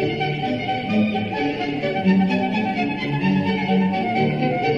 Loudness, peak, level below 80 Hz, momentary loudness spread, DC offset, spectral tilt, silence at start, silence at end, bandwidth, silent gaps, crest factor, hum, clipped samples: -21 LUFS; -8 dBFS; -52 dBFS; 5 LU; 0.1%; -8 dB/octave; 0 s; 0 s; 6.6 kHz; none; 14 dB; none; under 0.1%